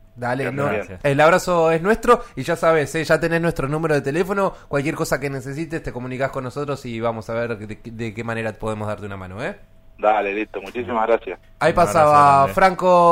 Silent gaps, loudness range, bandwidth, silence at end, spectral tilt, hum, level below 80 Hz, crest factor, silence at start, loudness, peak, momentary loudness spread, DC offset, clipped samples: none; 9 LU; 16 kHz; 0 s; -6 dB/octave; none; -42 dBFS; 18 dB; 0.15 s; -20 LUFS; -2 dBFS; 14 LU; under 0.1%; under 0.1%